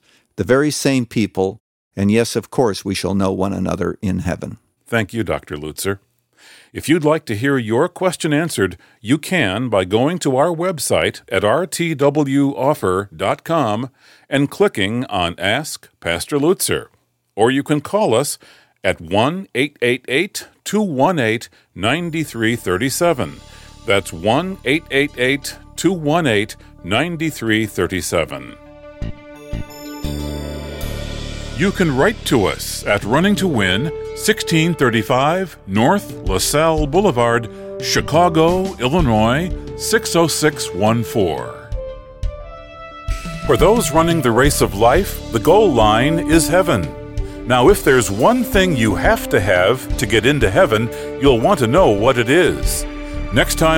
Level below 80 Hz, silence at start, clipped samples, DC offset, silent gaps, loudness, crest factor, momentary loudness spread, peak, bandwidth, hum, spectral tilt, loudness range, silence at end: -32 dBFS; 0.4 s; under 0.1%; under 0.1%; 1.60-1.91 s; -17 LUFS; 16 dB; 14 LU; -2 dBFS; 17 kHz; none; -5 dB/octave; 7 LU; 0 s